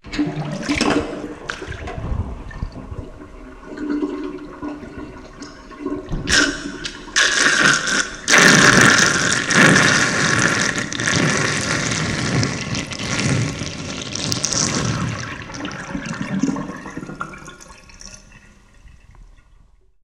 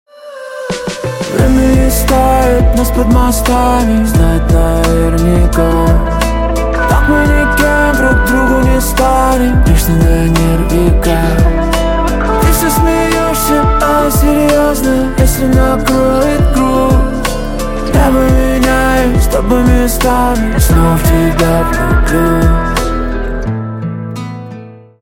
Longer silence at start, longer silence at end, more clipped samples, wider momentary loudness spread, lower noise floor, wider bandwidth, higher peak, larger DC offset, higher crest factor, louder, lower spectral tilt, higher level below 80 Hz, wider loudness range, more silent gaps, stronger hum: second, 0.05 s vs 0.2 s; first, 0.75 s vs 0.25 s; neither; first, 22 LU vs 8 LU; first, -52 dBFS vs -30 dBFS; about the same, 16.5 kHz vs 17 kHz; about the same, 0 dBFS vs 0 dBFS; neither; first, 20 dB vs 10 dB; second, -17 LUFS vs -11 LUFS; second, -3 dB/octave vs -6 dB/octave; second, -38 dBFS vs -14 dBFS; first, 17 LU vs 1 LU; neither; neither